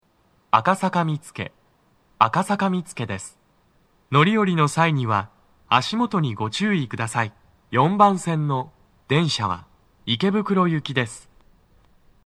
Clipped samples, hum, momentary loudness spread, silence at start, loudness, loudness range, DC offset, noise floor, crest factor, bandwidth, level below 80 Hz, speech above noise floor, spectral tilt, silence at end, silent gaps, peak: under 0.1%; none; 13 LU; 0.55 s; -22 LUFS; 3 LU; under 0.1%; -62 dBFS; 22 dB; 13 kHz; -62 dBFS; 41 dB; -5.5 dB/octave; 1.05 s; none; 0 dBFS